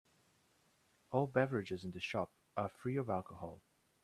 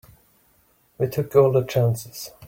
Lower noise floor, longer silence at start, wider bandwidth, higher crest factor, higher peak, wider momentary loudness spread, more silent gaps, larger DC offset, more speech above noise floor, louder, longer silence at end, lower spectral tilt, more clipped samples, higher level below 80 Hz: first, -74 dBFS vs -61 dBFS; about the same, 1.1 s vs 1 s; second, 13 kHz vs 16.5 kHz; first, 24 dB vs 18 dB; second, -18 dBFS vs -4 dBFS; about the same, 12 LU vs 12 LU; neither; neither; second, 35 dB vs 40 dB; second, -39 LUFS vs -21 LUFS; first, 0.45 s vs 0 s; about the same, -7 dB/octave vs -6.5 dB/octave; neither; second, -74 dBFS vs -58 dBFS